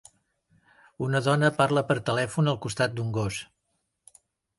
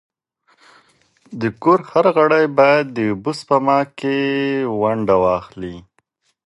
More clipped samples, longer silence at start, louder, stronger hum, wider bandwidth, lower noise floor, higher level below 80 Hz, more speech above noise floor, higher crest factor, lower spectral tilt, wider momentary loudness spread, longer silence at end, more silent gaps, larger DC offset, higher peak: neither; second, 1 s vs 1.3 s; second, -26 LUFS vs -17 LUFS; neither; about the same, 11.5 kHz vs 11.5 kHz; first, -77 dBFS vs -65 dBFS; second, -58 dBFS vs -52 dBFS; first, 52 dB vs 48 dB; about the same, 20 dB vs 18 dB; second, -5.5 dB/octave vs -7 dB/octave; about the same, 9 LU vs 11 LU; first, 1.15 s vs 0.65 s; neither; neither; second, -8 dBFS vs 0 dBFS